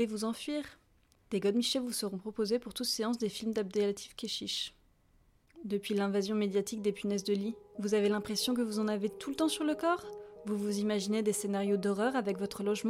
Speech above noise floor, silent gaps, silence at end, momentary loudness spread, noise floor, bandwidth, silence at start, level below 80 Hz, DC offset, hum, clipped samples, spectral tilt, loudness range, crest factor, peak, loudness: 35 dB; none; 0 s; 7 LU; -68 dBFS; 16 kHz; 0 s; -68 dBFS; under 0.1%; none; under 0.1%; -4.5 dB/octave; 3 LU; 14 dB; -18 dBFS; -33 LUFS